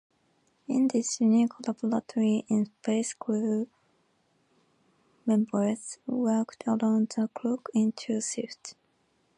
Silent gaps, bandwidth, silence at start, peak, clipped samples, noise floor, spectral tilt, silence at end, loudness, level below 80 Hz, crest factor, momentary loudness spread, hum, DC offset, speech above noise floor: none; 11 kHz; 0.7 s; -14 dBFS; under 0.1%; -71 dBFS; -5.5 dB/octave; 0.65 s; -28 LUFS; -80 dBFS; 14 dB; 10 LU; none; under 0.1%; 43 dB